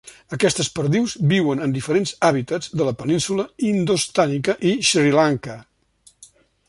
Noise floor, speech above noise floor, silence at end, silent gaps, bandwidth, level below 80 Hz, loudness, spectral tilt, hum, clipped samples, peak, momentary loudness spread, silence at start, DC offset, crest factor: -56 dBFS; 36 dB; 1.05 s; none; 11.5 kHz; -56 dBFS; -20 LUFS; -4.5 dB/octave; none; under 0.1%; -2 dBFS; 7 LU; 0.05 s; under 0.1%; 18 dB